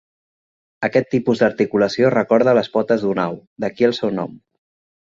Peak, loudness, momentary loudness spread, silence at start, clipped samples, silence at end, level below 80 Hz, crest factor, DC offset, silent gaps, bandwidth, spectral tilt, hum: 0 dBFS; -18 LUFS; 11 LU; 0.8 s; under 0.1%; 0.7 s; -60 dBFS; 18 dB; under 0.1%; 3.47-3.56 s; 7.6 kHz; -6.5 dB/octave; none